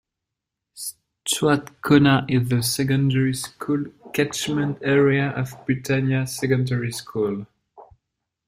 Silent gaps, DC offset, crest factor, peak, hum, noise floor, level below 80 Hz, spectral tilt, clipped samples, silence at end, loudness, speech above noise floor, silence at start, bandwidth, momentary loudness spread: none; under 0.1%; 20 dB; -2 dBFS; none; -84 dBFS; -56 dBFS; -5.5 dB/octave; under 0.1%; 0.65 s; -22 LUFS; 63 dB; 0.75 s; 16 kHz; 11 LU